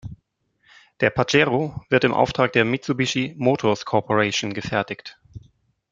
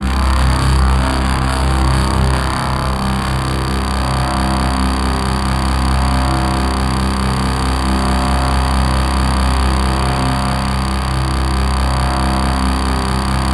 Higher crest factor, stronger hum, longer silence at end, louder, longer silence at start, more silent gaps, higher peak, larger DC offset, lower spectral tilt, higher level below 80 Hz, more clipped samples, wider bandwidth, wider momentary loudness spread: first, 20 dB vs 12 dB; neither; first, 0.55 s vs 0 s; second, -21 LUFS vs -16 LUFS; about the same, 0.05 s vs 0 s; neither; about the same, -2 dBFS vs -2 dBFS; neither; about the same, -5 dB/octave vs -5.5 dB/octave; second, -54 dBFS vs -18 dBFS; neither; second, 7.8 kHz vs 12.5 kHz; first, 7 LU vs 3 LU